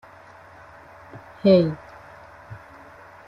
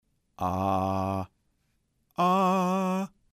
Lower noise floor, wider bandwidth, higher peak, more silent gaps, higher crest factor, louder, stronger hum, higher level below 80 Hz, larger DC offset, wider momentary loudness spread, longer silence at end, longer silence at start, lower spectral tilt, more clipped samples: second, -47 dBFS vs -73 dBFS; second, 6.2 kHz vs 14.5 kHz; first, -6 dBFS vs -16 dBFS; neither; first, 20 dB vs 14 dB; first, -19 LUFS vs -27 LUFS; neither; about the same, -58 dBFS vs -62 dBFS; neither; first, 28 LU vs 11 LU; first, 0.7 s vs 0.25 s; first, 1.15 s vs 0.4 s; first, -9 dB/octave vs -7 dB/octave; neither